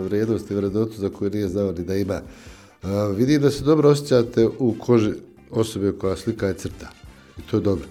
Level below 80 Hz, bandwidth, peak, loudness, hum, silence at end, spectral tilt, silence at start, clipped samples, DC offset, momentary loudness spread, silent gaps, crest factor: -48 dBFS; 16 kHz; -4 dBFS; -22 LUFS; none; 0 s; -7 dB/octave; 0 s; under 0.1%; under 0.1%; 14 LU; none; 18 dB